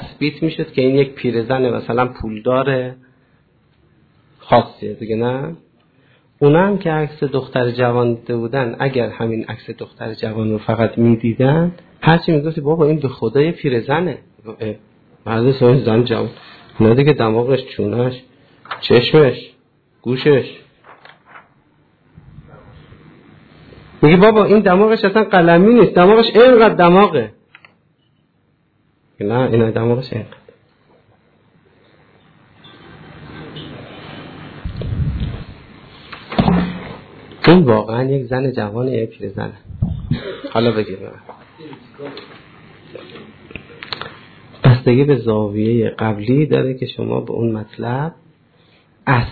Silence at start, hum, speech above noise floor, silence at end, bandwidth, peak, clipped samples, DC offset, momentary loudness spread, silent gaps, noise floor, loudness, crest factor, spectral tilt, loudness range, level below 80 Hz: 0 s; none; 45 dB; 0 s; 4.8 kHz; 0 dBFS; under 0.1%; under 0.1%; 23 LU; none; -60 dBFS; -15 LUFS; 16 dB; -10.5 dB/octave; 13 LU; -42 dBFS